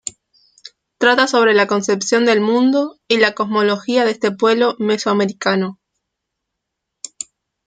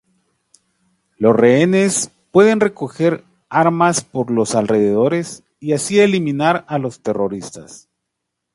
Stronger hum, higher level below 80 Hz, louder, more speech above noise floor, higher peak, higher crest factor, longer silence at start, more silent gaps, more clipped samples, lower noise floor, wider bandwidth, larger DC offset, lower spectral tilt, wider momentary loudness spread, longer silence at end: neither; second, -66 dBFS vs -60 dBFS; about the same, -16 LUFS vs -16 LUFS; about the same, 63 dB vs 62 dB; about the same, -2 dBFS vs 0 dBFS; about the same, 16 dB vs 16 dB; second, 0.05 s vs 1.2 s; neither; neither; about the same, -78 dBFS vs -77 dBFS; second, 9.4 kHz vs 11.5 kHz; neither; about the same, -4 dB/octave vs -5 dB/octave; first, 17 LU vs 11 LU; first, 1.95 s vs 0.8 s